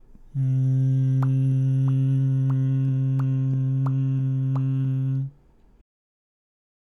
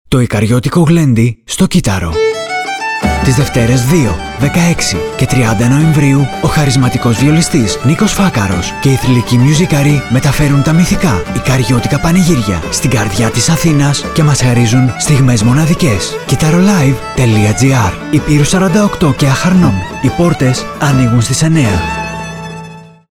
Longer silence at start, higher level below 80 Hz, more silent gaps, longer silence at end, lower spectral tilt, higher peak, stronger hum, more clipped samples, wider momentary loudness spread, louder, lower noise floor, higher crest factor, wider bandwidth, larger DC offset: first, 0.35 s vs 0.1 s; second, -54 dBFS vs -28 dBFS; neither; first, 1.5 s vs 0.25 s; first, -10.5 dB/octave vs -5.5 dB/octave; second, -14 dBFS vs 0 dBFS; neither; neither; about the same, 4 LU vs 5 LU; second, -23 LUFS vs -10 LUFS; first, -54 dBFS vs -31 dBFS; about the same, 8 dB vs 10 dB; second, 3 kHz vs 17 kHz; second, under 0.1% vs 0.6%